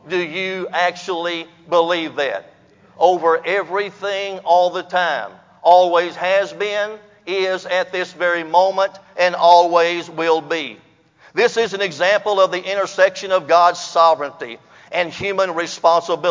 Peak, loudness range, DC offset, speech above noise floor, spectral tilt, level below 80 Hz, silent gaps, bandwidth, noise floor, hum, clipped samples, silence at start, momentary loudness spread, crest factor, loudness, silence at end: 0 dBFS; 3 LU; under 0.1%; 33 dB; -3.5 dB/octave; -66 dBFS; none; 7.6 kHz; -51 dBFS; none; under 0.1%; 0.05 s; 11 LU; 18 dB; -17 LUFS; 0 s